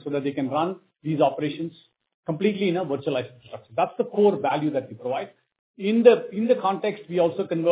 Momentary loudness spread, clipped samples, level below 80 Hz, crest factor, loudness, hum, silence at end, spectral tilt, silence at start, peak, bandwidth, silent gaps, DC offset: 14 LU; under 0.1%; -72 dBFS; 22 dB; -24 LUFS; none; 0 s; -10.5 dB/octave; 0.05 s; -2 dBFS; 4 kHz; 2.14-2.23 s, 5.59-5.74 s; under 0.1%